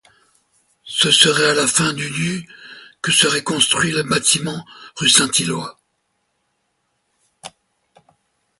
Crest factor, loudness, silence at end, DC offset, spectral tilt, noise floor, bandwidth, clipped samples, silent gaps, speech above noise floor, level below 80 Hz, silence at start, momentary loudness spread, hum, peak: 20 dB; -15 LUFS; 1.1 s; under 0.1%; -2 dB/octave; -70 dBFS; 16 kHz; under 0.1%; none; 52 dB; -58 dBFS; 0.85 s; 18 LU; none; 0 dBFS